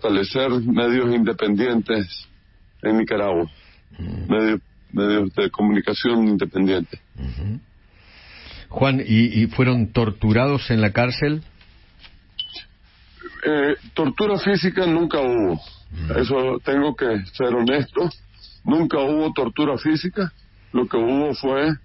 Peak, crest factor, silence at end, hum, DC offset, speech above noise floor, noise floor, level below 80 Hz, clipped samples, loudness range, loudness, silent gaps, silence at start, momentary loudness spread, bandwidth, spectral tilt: -4 dBFS; 18 dB; 0.05 s; none; under 0.1%; 32 dB; -52 dBFS; -42 dBFS; under 0.1%; 4 LU; -21 LUFS; none; 0 s; 13 LU; 5.8 kHz; -10.5 dB/octave